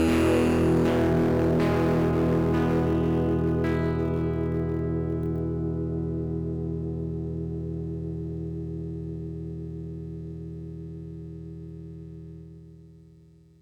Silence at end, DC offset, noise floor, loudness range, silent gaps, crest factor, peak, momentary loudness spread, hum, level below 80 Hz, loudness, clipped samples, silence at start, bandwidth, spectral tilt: 0.7 s; under 0.1%; -54 dBFS; 15 LU; none; 14 dB; -12 dBFS; 17 LU; 60 Hz at -60 dBFS; -40 dBFS; -27 LUFS; under 0.1%; 0 s; 14 kHz; -8 dB/octave